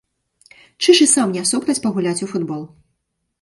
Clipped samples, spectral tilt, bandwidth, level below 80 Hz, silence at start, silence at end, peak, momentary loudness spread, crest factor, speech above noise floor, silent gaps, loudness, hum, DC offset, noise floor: under 0.1%; -3 dB/octave; 11.5 kHz; -64 dBFS; 0.8 s; 0.75 s; 0 dBFS; 13 LU; 18 dB; 56 dB; none; -16 LUFS; none; under 0.1%; -73 dBFS